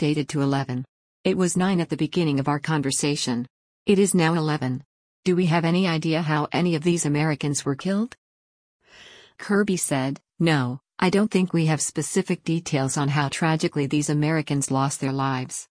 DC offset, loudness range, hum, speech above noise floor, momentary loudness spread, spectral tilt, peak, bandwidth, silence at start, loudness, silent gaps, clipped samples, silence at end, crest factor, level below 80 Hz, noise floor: under 0.1%; 3 LU; none; 26 dB; 7 LU; -5 dB/octave; -8 dBFS; 10.5 kHz; 0 s; -23 LUFS; 0.89-1.24 s, 3.50-3.86 s, 4.85-5.23 s, 8.18-8.80 s; under 0.1%; 0.05 s; 16 dB; -60 dBFS; -49 dBFS